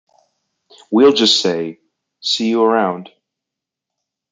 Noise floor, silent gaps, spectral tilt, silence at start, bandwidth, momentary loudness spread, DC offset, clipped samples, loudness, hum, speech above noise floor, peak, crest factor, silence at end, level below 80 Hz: -83 dBFS; none; -3.5 dB/octave; 0.9 s; 9.4 kHz; 14 LU; under 0.1%; under 0.1%; -15 LUFS; none; 69 dB; -2 dBFS; 16 dB; 1.25 s; -68 dBFS